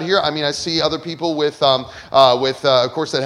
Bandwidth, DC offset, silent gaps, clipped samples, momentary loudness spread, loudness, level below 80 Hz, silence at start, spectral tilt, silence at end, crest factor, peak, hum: 12 kHz; under 0.1%; none; under 0.1%; 7 LU; -17 LUFS; -52 dBFS; 0 s; -4 dB/octave; 0 s; 18 dB; 0 dBFS; none